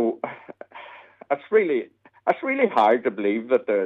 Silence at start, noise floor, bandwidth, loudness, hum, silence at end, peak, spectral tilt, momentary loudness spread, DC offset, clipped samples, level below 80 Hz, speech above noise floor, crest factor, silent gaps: 0 s; -45 dBFS; 7 kHz; -23 LUFS; none; 0 s; -6 dBFS; -7 dB/octave; 22 LU; under 0.1%; under 0.1%; -76 dBFS; 24 dB; 16 dB; none